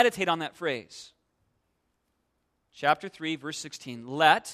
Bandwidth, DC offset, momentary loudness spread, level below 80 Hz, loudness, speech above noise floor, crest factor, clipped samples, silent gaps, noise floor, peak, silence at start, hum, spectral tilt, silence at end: 14 kHz; under 0.1%; 17 LU; -72 dBFS; -28 LUFS; 49 dB; 24 dB; under 0.1%; none; -76 dBFS; -6 dBFS; 0 s; none; -3.5 dB/octave; 0 s